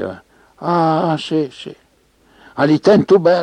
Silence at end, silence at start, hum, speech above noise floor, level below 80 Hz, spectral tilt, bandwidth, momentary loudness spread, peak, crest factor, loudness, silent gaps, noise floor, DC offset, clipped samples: 0 s; 0 s; none; 41 dB; -56 dBFS; -7 dB/octave; 9.8 kHz; 20 LU; -2 dBFS; 14 dB; -15 LUFS; none; -55 dBFS; under 0.1%; under 0.1%